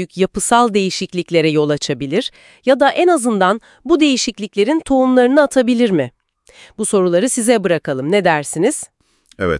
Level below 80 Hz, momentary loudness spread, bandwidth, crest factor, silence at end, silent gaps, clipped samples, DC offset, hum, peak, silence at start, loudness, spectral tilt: -50 dBFS; 9 LU; 12 kHz; 16 dB; 0 s; none; under 0.1%; under 0.1%; none; 0 dBFS; 0 s; -15 LUFS; -4.5 dB/octave